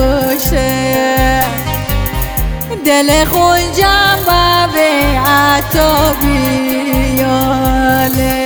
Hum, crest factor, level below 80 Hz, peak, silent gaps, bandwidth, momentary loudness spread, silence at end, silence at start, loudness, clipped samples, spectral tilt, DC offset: none; 10 dB; -20 dBFS; 0 dBFS; none; over 20 kHz; 7 LU; 0 s; 0 s; -11 LUFS; under 0.1%; -4.5 dB/octave; under 0.1%